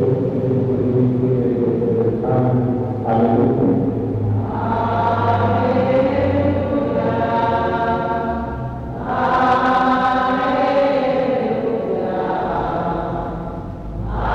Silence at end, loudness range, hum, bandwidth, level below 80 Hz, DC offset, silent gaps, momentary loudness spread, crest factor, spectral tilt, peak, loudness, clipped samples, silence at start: 0 s; 2 LU; none; 7.2 kHz; -36 dBFS; under 0.1%; none; 8 LU; 14 dB; -9 dB/octave; -4 dBFS; -18 LUFS; under 0.1%; 0 s